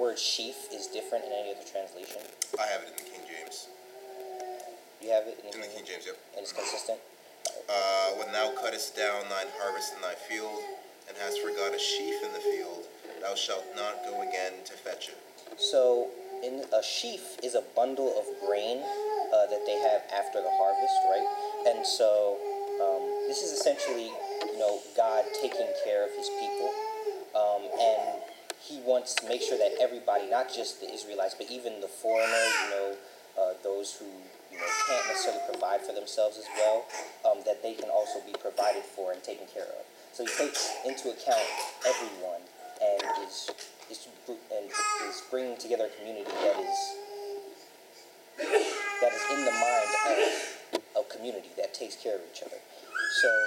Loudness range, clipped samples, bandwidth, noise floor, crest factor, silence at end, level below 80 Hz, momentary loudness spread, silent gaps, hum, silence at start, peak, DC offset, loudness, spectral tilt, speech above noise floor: 7 LU; under 0.1%; 16 kHz; -53 dBFS; 20 dB; 0 s; under -90 dBFS; 15 LU; none; none; 0 s; -12 dBFS; under 0.1%; -31 LUFS; 0 dB/octave; 22 dB